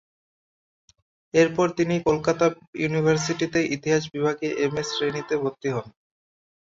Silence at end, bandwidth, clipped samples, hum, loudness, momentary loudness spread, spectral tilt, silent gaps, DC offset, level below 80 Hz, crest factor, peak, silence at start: 0.8 s; 7.8 kHz; under 0.1%; none; -24 LUFS; 6 LU; -5 dB/octave; 2.67-2.73 s; under 0.1%; -58 dBFS; 18 dB; -6 dBFS; 1.35 s